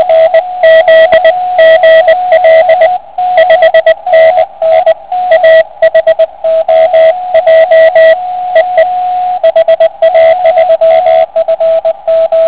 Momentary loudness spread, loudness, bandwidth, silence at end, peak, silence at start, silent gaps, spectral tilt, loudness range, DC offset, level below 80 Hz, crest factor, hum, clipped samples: 6 LU; -6 LUFS; 4 kHz; 0 s; 0 dBFS; 0 s; none; -5 dB/octave; 2 LU; 0.8%; -48 dBFS; 6 dB; none; 6%